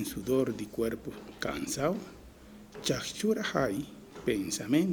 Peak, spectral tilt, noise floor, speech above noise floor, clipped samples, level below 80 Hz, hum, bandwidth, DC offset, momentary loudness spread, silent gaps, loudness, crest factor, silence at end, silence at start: -14 dBFS; -4.5 dB/octave; -51 dBFS; 20 dB; under 0.1%; -56 dBFS; none; over 20 kHz; under 0.1%; 17 LU; none; -32 LUFS; 18 dB; 0 s; 0 s